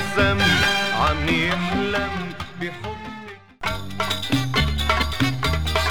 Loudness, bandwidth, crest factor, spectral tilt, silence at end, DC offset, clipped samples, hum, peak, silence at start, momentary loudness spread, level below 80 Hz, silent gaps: -21 LUFS; 18.5 kHz; 18 dB; -4.5 dB/octave; 0 s; 1%; under 0.1%; none; -6 dBFS; 0 s; 15 LU; -32 dBFS; none